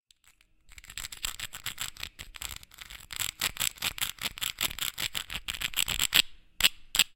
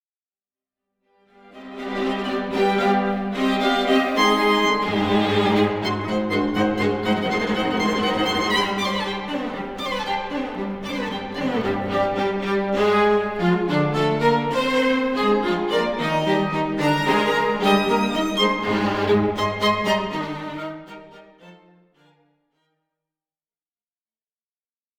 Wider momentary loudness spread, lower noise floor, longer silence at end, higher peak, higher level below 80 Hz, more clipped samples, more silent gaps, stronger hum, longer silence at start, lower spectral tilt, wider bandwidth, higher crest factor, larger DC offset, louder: first, 16 LU vs 9 LU; second, -64 dBFS vs under -90 dBFS; second, 0.05 s vs 3.45 s; first, 0 dBFS vs -4 dBFS; about the same, -52 dBFS vs -50 dBFS; neither; neither; neither; second, 0.65 s vs 1.55 s; second, 1 dB/octave vs -5.5 dB/octave; second, 17 kHz vs 19 kHz; first, 32 dB vs 18 dB; neither; second, -30 LUFS vs -21 LUFS